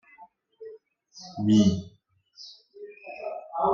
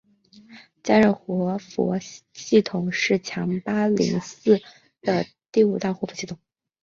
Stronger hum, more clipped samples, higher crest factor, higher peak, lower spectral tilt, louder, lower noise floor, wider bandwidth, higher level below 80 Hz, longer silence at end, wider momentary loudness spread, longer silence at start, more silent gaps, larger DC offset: neither; neither; about the same, 18 dB vs 20 dB; second, -10 dBFS vs -4 dBFS; about the same, -7 dB/octave vs -6 dB/octave; about the same, -25 LUFS vs -23 LUFS; about the same, -55 dBFS vs -52 dBFS; about the same, 7.6 kHz vs 7.6 kHz; about the same, -62 dBFS vs -62 dBFS; second, 0 s vs 0.5 s; first, 25 LU vs 12 LU; second, 0.2 s vs 0.5 s; neither; neither